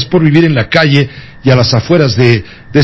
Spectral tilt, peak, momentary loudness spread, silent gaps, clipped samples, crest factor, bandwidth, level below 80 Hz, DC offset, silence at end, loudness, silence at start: -6.5 dB/octave; 0 dBFS; 7 LU; none; 0.7%; 10 dB; 8 kHz; -36 dBFS; under 0.1%; 0 s; -10 LUFS; 0 s